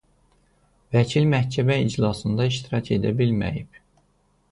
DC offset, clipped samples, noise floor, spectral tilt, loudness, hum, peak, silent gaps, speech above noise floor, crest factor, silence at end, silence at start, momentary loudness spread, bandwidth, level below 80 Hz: under 0.1%; under 0.1%; -64 dBFS; -7 dB/octave; -23 LUFS; none; -6 dBFS; none; 43 dB; 18 dB; 0.85 s; 0.9 s; 6 LU; 11 kHz; -48 dBFS